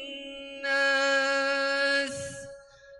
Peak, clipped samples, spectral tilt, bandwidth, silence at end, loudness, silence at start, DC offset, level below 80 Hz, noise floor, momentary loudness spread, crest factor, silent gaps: -14 dBFS; under 0.1%; -1.5 dB/octave; 11.5 kHz; 0 s; -25 LUFS; 0 s; under 0.1%; -66 dBFS; -49 dBFS; 16 LU; 14 dB; none